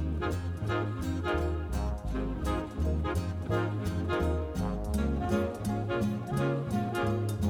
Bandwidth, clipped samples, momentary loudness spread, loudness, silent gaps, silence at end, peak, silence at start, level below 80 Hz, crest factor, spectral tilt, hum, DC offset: 17 kHz; under 0.1%; 3 LU; -32 LUFS; none; 0 s; -16 dBFS; 0 s; -38 dBFS; 14 dB; -7.5 dB/octave; none; under 0.1%